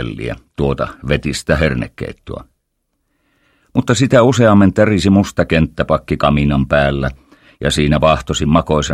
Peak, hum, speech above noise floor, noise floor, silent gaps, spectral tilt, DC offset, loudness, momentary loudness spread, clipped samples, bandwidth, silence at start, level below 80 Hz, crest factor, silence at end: 0 dBFS; none; 55 dB; -69 dBFS; none; -6 dB/octave; under 0.1%; -14 LUFS; 14 LU; under 0.1%; 14 kHz; 0 s; -30 dBFS; 14 dB; 0 s